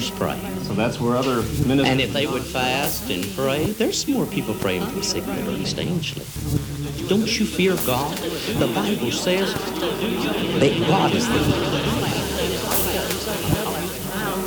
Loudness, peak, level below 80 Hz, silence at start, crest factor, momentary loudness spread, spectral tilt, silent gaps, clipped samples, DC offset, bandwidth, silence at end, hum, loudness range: -22 LUFS; -6 dBFS; -40 dBFS; 0 s; 16 dB; 7 LU; -4.5 dB/octave; none; under 0.1%; under 0.1%; over 20 kHz; 0 s; none; 3 LU